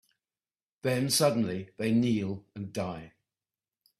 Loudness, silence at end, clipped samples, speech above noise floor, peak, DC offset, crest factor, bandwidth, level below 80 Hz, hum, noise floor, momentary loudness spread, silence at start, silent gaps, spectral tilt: -30 LUFS; 0.9 s; under 0.1%; over 61 dB; -12 dBFS; under 0.1%; 20 dB; 15.5 kHz; -66 dBFS; none; under -90 dBFS; 13 LU; 0.85 s; none; -5 dB/octave